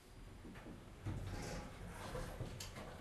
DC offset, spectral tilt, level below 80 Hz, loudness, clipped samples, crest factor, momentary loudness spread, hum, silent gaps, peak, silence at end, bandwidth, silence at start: under 0.1%; -5 dB/octave; -54 dBFS; -50 LUFS; under 0.1%; 16 dB; 9 LU; none; none; -34 dBFS; 0 s; 13 kHz; 0 s